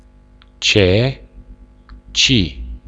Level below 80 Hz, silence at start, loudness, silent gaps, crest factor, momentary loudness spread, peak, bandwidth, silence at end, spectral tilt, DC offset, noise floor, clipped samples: -34 dBFS; 0.6 s; -15 LUFS; none; 18 dB; 11 LU; 0 dBFS; 8.6 kHz; 0.1 s; -4 dB/octave; under 0.1%; -46 dBFS; under 0.1%